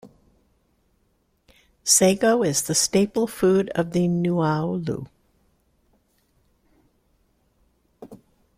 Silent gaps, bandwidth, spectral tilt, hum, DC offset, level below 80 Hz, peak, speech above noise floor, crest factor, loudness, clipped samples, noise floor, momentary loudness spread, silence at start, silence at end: none; 16.5 kHz; -4 dB/octave; none; under 0.1%; -58 dBFS; -4 dBFS; 47 dB; 20 dB; -21 LUFS; under 0.1%; -67 dBFS; 13 LU; 0.05 s; 0.45 s